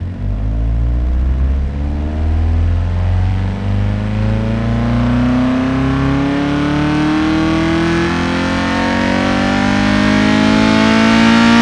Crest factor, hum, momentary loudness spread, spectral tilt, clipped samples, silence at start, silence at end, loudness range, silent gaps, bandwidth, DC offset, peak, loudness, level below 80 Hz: 12 dB; none; 7 LU; -6.5 dB/octave; under 0.1%; 0 s; 0 s; 4 LU; none; 10.5 kHz; under 0.1%; 0 dBFS; -14 LUFS; -22 dBFS